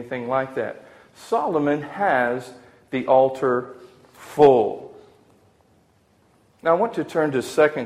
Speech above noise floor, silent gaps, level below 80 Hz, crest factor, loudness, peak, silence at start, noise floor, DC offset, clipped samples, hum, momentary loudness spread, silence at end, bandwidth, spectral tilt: 39 dB; none; -62 dBFS; 20 dB; -21 LUFS; -2 dBFS; 0 s; -60 dBFS; under 0.1%; under 0.1%; none; 15 LU; 0 s; 15 kHz; -6 dB/octave